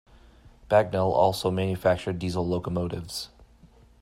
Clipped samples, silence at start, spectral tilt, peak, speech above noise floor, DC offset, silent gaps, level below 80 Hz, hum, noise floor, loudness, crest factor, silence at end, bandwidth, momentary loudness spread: under 0.1%; 0.45 s; -6 dB/octave; -8 dBFS; 30 dB; under 0.1%; none; -52 dBFS; none; -55 dBFS; -26 LUFS; 20 dB; 0.6 s; 16 kHz; 11 LU